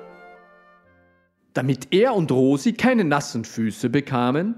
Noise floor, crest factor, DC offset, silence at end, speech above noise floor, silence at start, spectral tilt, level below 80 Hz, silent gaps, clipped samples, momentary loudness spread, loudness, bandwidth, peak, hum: -62 dBFS; 18 dB; under 0.1%; 0.05 s; 42 dB; 0 s; -6 dB/octave; -64 dBFS; none; under 0.1%; 8 LU; -21 LUFS; 13.5 kHz; -4 dBFS; none